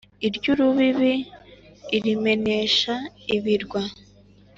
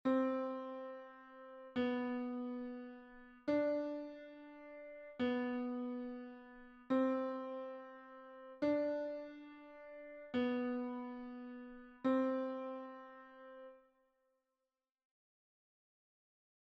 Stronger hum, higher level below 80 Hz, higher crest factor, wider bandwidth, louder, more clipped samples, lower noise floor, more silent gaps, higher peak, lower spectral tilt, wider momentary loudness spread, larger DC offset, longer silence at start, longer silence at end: first, 50 Hz at -55 dBFS vs none; first, -56 dBFS vs -78 dBFS; about the same, 16 dB vs 18 dB; first, 7.6 kHz vs 6.2 kHz; first, -22 LUFS vs -41 LUFS; neither; second, -52 dBFS vs under -90 dBFS; neither; first, -8 dBFS vs -24 dBFS; about the same, -5 dB/octave vs -4 dB/octave; second, 10 LU vs 19 LU; neither; first, 0.2 s vs 0.05 s; second, 0.65 s vs 2.95 s